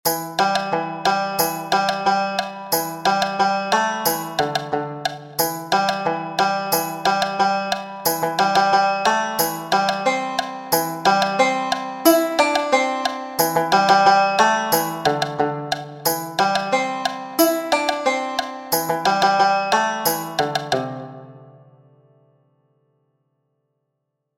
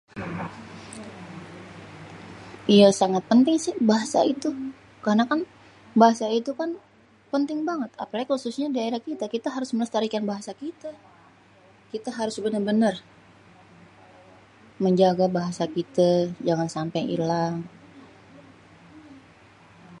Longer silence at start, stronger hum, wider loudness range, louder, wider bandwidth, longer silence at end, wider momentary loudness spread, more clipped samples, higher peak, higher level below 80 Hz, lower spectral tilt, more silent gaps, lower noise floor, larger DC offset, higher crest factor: about the same, 0.05 s vs 0.15 s; neither; second, 4 LU vs 8 LU; first, -20 LUFS vs -24 LUFS; first, 17 kHz vs 11.5 kHz; first, 2.9 s vs 0 s; second, 8 LU vs 21 LU; neither; about the same, 0 dBFS vs -2 dBFS; about the same, -62 dBFS vs -66 dBFS; second, -3 dB/octave vs -6 dB/octave; neither; first, -77 dBFS vs -55 dBFS; neither; about the same, 20 dB vs 22 dB